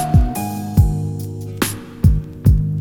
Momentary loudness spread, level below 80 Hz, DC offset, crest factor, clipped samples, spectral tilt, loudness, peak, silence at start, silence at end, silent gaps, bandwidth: 8 LU; -22 dBFS; under 0.1%; 16 dB; under 0.1%; -6.5 dB/octave; -19 LUFS; 0 dBFS; 0 s; 0 s; none; 18.5 kHz